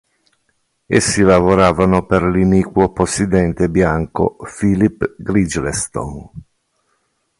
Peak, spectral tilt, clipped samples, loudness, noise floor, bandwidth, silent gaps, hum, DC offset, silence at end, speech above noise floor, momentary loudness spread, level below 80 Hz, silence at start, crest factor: 0 dBFS; -6 dB/octave; under 0.1%; -15 LUFS; -65 dBFS; 11.5 kHz; none; none; under 0.1%; 1 s; 51 dB; 9 LU; -34 dBFS; 0.9 s; 16 dB